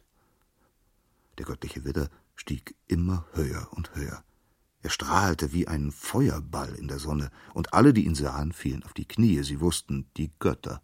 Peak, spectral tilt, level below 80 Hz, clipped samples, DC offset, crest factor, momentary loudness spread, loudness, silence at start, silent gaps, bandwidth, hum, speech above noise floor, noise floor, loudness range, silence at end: -2 dBFS; -6 dB/octave; -40 dBFS; under 0.1%; under 0.1%; 26 dB; 13 LU; -28 LUFS; 1.35 s; none; 16.5 kHz; none; 41 dB; -68 dBFS; 8 LU; 0.05 s